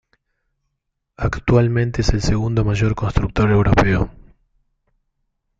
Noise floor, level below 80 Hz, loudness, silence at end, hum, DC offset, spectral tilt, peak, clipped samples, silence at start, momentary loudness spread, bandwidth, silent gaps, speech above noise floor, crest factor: -75 dBFS; -30 dBFS; -18 LUFS; 1.5 s; none; under 0.1%; -7 dB/octave; -2 dBFS; under 0.1%; 1.2 s; 7 LU; 7.8 kHz; none; 59 dB; 18 dB